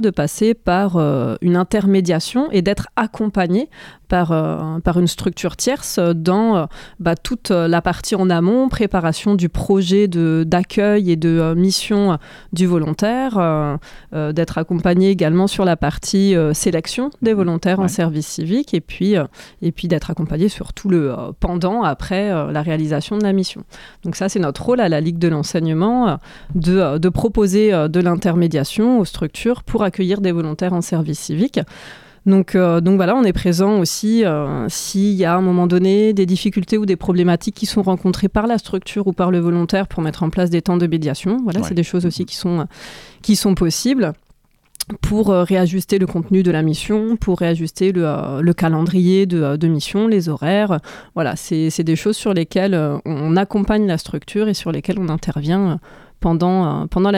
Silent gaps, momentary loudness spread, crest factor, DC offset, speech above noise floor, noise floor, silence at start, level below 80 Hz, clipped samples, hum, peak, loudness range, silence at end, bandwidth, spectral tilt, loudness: none; 7 LU; 12 dB; under 0.1%; 38 dB; -54 dBFS; 0 s; -38 dBFS; under 0.1%; none; -4 dBFS; 3 LU; 0 s; 16 kHz; -6.5 dB/octave; -17 LUFS